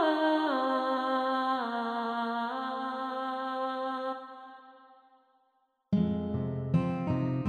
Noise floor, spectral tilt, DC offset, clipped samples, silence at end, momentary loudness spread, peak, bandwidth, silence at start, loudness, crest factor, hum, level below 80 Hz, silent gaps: -73 dBFS; -8 dB/octave; under 0.1%; under 0.1%; 0 s; 6 LU; -16 dBFS; 9.6 kHz; 0 s; -31 LUFS; 16 dB; none; -62 dBFS; none